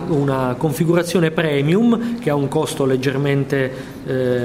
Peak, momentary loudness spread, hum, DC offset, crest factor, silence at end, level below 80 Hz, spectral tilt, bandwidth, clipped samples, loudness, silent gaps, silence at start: -4 dBFS; 5 LU; none; under 0.1%; 14 dB; 0 s; -48 dBFS; -6.5 dB/octave; 16 kHz; under 0.1%; -18 LUFS; none; 0 s